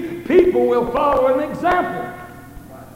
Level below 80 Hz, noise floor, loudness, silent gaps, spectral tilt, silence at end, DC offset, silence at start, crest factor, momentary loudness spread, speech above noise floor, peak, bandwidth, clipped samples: -42 dBFS; -37 dBFS; -17 LUFS; none; -7 dB/octave; 0 s; under 0.1%; 0 s; 16 dB; 16 LU; 21 dB; -2 dBFS; 16 kHz; under 0.1%